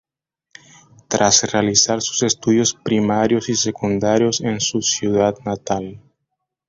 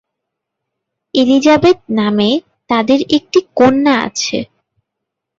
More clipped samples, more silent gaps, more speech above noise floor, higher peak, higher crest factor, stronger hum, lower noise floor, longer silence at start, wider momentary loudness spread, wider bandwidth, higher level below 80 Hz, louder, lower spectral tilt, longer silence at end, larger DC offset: neither; neither; second, 62 dB vs 66 dB; about the same, 0 dBFS vs 0 dBFS; about the same, 18 dB vs 14 dB; neither; about the same, -80 dBFS vs -78 dBFS; about the same, 1.1 s vs 1.15 s; about the same, 9 LU vs 9 LU; about the same, 7.8 kHz vs 7.8 kHz; about the same, -52 dBFS vs -50 dBFS; second, -17 LUFS vs -13 LUFS; about the same, -3.5 dB/octave vs -4.5 dB/octave; second, 0.7 s vs 0.95 s; neither